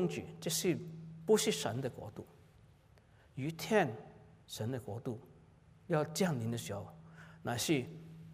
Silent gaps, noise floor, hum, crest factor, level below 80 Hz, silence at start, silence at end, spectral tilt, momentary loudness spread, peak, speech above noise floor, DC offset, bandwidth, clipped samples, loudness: none; -64 dBFS; none; 20 dB; -70 dBFS; 0 s; 0 s; -4.5 dB/octave; 19 LU; -18 dBFS; 28 dB; under 0.1%; 16 kHz; under 0.1%; -36 LUFS